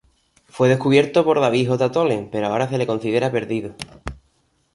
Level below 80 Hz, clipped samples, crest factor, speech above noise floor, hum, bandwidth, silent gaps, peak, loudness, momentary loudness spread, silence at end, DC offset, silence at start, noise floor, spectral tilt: -48 dBFS; under 0.1%; 18 dB; 45 dB; none; 11.5 kHz; none; -2 dBFS; -19 LUFS; 18 LU; 0.6 s; under 0.1%; 0.55 s; -64 dBFS; -6.5 dB/octave